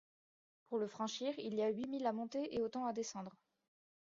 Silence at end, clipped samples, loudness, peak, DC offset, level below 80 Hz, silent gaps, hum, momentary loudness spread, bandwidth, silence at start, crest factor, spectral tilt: 0.75 s; under 0.1%; -41 LUFS; -24 dBFS; under 0.1%; -80 dBFS; none; none; 6 LU; 7.4 kHz; 0.7 s; 18 dB; -4.5 dB/octave